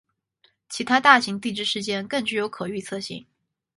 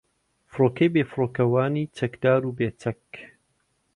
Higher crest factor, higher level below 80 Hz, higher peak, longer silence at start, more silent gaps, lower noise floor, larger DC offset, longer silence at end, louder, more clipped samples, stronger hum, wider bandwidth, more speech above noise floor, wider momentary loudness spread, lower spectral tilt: first, 24 dB vs 18 dB; second, -68 dBFS vs -60 dBFS; first, -2 dBFS vs -8 dBFS; first, 0.7 s vs 0.55 s; neither; second, -65 dBFS vs -71 dBFS; neither; second, 0.55 s vs 0.7 s; about the same, -22 LUFS vs -24 LUFS; neither; neither; about the same, 11.5 kHz vs 11 kHz; second, 42 dB vs 47 dB; about the same, 17 LU vs 18 LU; second, -3 dB/octave vs -8.5 dB/octave